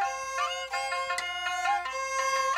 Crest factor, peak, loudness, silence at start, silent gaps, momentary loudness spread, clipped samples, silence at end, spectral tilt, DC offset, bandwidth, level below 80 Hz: 14 dB; -16 dBFS; -30 LUFS; 0 s; none; 3 LU; under 0.1%; 0 s; 1.5 dB/octave; under 0.1%; 16 kHz; -64 dBFS